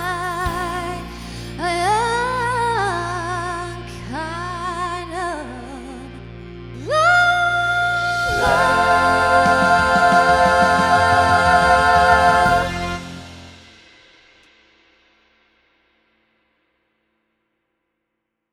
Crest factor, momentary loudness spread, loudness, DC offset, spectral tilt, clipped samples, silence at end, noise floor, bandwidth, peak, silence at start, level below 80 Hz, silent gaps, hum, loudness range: 18 dB; 19 LU; -17 LUFS; under 0.1%; -4 dB/octave; under 0.1%; 4.95 s; -77 dBFS; 15 kHz; 0 dBFS; 0 s; -38 dBFS; none; none; 13 LU